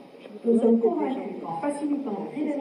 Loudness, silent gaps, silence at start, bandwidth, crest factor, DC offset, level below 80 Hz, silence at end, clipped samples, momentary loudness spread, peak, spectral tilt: -26 LUFS; none; 0 s; 11 kHz; 14 dB; under 0.1%; -84 dBFS; 0 s; under 0.1%; 12 LU; -10 dBFS; -7.5 dB/octave